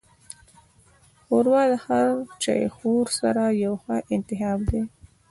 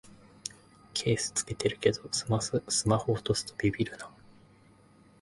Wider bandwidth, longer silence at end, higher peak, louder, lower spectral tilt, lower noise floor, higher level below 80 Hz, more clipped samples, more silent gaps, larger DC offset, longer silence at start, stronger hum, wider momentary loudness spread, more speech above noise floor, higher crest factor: about the same, 12 kHz vs 11.5 kHz; second, 0.4 s vs 1.1 s; about the same, -8 dBFS vs -10 dBFS; first, -24 LUFS vs -30 LUFS; first, -5.5 dB/octave vs -4 dB/octave; about the same, -57 dBFS vs -59 dBFS; first, -44 dBFS vs -56 dBFS; neither; neither; neither; first, 1.3 s vs 0.05 s; neither; about the same, 13 LU vs 14 LU; first, 34 dB vs 30 dB; second, 16 dB vs 22 dB